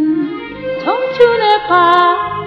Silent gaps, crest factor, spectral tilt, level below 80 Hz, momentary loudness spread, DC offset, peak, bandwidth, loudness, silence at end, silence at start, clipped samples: none; 12 dB; -6 dB/octave; -48 dBFS; 12 LU; under 0.1%; 0 dBFS; 6.8 kHz; -12 LUFS; 0 s; 0 s; under 0.1%